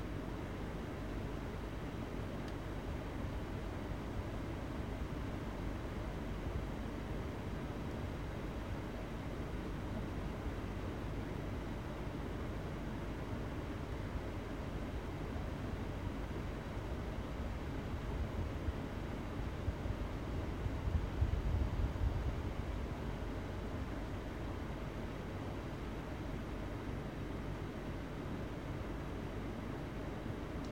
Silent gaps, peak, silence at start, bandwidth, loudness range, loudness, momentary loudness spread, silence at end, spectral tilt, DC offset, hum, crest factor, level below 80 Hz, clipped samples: none; -22 dBFS; 0 s; 16.5 kHz; 4 LU; -43 LUFS; 4 LU; 0 s; -7 dB/octave; under 0.1%; none; 18 dB; -46 dBFS; under 0.1%